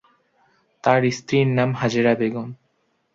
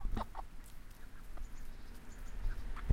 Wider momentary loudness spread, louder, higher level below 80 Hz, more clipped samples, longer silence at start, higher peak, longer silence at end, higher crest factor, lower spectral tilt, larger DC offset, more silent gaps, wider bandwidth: second, 8 LU vs 12 LU; first, -20 LUFS vs -50 LUFS; second, -60 dBFS vs -42 dBFS; neither; first, 0.85 s vs 0 s; first, -2 dBFS vs -18 dBFS; first, 0.6 s vs 0 s; about the same, 20 dB vs 20 dB; about the same, -6.5 dB/octave vs -6.5 dB/octave; neither; neither; second, 7.6 kHz vs 15.5 kHz